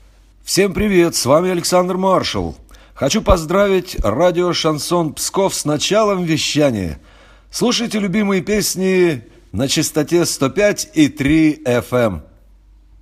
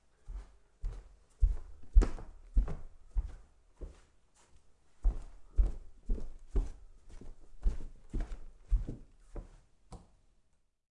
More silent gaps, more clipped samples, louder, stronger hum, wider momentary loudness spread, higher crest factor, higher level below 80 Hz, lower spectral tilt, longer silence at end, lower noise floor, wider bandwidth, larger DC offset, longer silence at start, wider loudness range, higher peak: neither; neither; first, -16 LUFS vs -39 LUFS; neither; second, 8 LU vs 20 LU; second, 16 dB vs 24 dB; about the same, -34 dBFS vs -36 dBFS; second, -4.5 dB/octave vs -7.5 dB/octave; second, 0.8 s vs 0.95 s; second, -46 dBFS vs -70 dBFS; first, 15.5 kHz vs 8 kHz; neither; first, 0.45 s vs 0.25 s; second, 2 LU vs 6 LU; first, 0 dBFS vs -10 dBFS